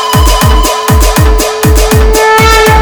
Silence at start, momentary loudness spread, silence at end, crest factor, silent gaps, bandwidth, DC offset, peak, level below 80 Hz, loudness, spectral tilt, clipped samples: 0 s; 4 LU; 0 s; 6 dB; none; over 20 kHz; under 0.1%; 0 dBFS; -10 dBFS; -6 LUFS; -4 dB/octave; 0.4%